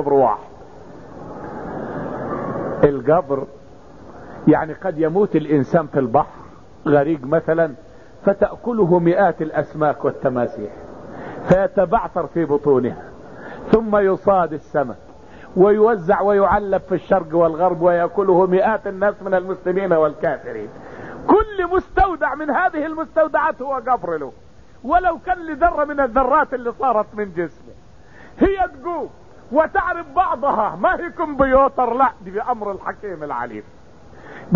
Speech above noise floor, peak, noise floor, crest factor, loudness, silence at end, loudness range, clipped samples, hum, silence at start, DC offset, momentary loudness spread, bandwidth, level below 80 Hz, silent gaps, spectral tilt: 27 dB; -2 dBFS; -45 dBFS; 16 dB; -19 LUFS; 0 s; 4 LU; under 0.1%; none; 0 s; 0.5%; 15 LU; 7.2 kHz; -40 dBFS; none; -9 dB/octave